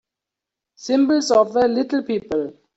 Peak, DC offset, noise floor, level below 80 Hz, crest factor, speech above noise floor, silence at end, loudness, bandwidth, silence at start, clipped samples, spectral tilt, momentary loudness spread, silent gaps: -4 dBFS; under 0.1%; -85 dBFS; -60 dBFS; 16 dB; 67 dB; 0.25 s; -19 LUFS; 8 kHz; 0.8 s; under 0.1%; -4.5 dB/octave; 10 LU; none